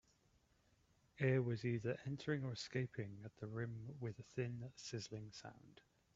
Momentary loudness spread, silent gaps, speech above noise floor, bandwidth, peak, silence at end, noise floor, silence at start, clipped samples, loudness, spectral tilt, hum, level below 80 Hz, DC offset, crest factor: 14 LU; none; 32 dB; 7.8 kHz; -24 dBFS; 0.45 s; -76 dBFS; 1.15 s; under 0.1%; -45 LUFS; -6.5 dB/octave; none; -76 dBFS; under 0.1%; 22 dB